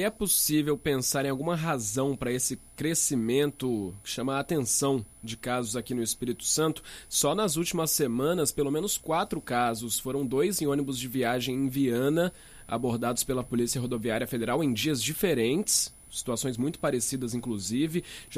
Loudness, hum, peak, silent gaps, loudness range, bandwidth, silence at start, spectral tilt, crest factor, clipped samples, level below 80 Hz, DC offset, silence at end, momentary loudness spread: -28 LUFS; none; -12 dBFS; none; 2 LU; 15.5 kHz; 0 s; -4 dB/octave; 16 dB; under 0.1%; -54 dBFS; under 0.1%; 0 s; 7 LU